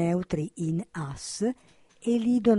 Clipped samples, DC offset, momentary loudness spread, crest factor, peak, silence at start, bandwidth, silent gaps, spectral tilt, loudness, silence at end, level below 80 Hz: under 0.1%; under 0.1%; 10 LU; 18 dB; -10 dBFS; 0 s; 11.5 kHz; none; -6.5 dB/octave; -29 LUFS; 0 s; -56 dBFS